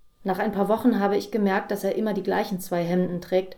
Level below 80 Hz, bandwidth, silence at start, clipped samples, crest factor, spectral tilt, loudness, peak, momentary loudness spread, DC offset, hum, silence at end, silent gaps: -58 dBFS; 19.5 kHz; 0.2 s; under 0.1%; 16 dB; -6.5 dB/octave; -25 LUFS; -8 dBFS; 5 LU; under 0.1%; none; 0 s; none